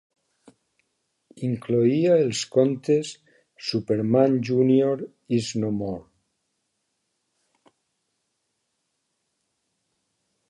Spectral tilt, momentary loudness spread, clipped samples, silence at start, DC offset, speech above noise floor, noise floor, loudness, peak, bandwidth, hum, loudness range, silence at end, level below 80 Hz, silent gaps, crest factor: -6.5 dB/octave; 12 LU; under 0.1%; 1.35 s; under 0.1%; 55 dB; -77 dBFS; -23 LUFS; -6 dBFS; 11.5 kHz; none; 10 LU; 4.5 s; -64 dBFS; none; 20 dB